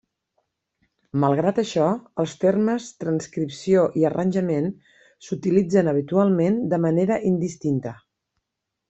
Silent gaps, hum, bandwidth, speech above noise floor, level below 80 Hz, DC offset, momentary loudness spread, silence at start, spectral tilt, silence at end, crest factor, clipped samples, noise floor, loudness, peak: none; none; 8.2 kHz; 61 dB; -62 dBFS; under 0.1%; 9 LU; 1.15 s; -7.5 dB/octave; 0.95 s; 18 dB; under 0.1%; -82 dBFS; -22 LUFS; -6 dBFS